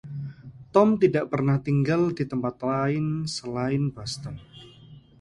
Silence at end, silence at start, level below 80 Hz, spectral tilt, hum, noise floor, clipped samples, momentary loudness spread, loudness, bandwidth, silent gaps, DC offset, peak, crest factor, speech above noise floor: 0.2 s; 0.05 s; -56 dBFS; -7 dB/octave; none; -49 dBFS; under 0.1%; 16 LU; -25 LUFS; 11.5 kHz; none; under 0.1%; -4 dBFS; 22 dB; 25 dB